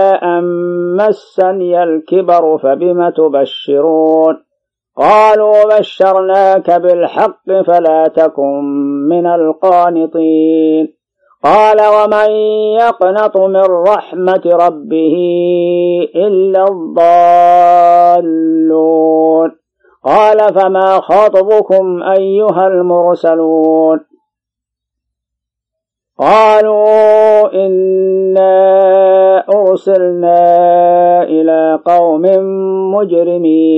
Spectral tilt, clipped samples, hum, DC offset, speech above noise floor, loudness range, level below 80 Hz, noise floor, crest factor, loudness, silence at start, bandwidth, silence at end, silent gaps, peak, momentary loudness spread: -7.5 dB/octave; under 0.1%; none; under 0.1%; 73 dB; 4 LU; -60 dBFS; -81 dBFS; 8 dB; -9 LUFS; 0 s; 7.8 kHz; 0 s; none; 0 dBFS; 7 LU